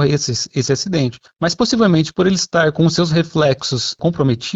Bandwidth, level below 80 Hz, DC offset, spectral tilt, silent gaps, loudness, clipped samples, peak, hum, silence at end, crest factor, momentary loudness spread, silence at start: 8 kHz; -48 dBFS; under 0.1%; -5 dB/octave; none; -16 LUFS; under 0.1%; -4 dBFS; none; 0 s; 14 dB; 5 LU; 0 s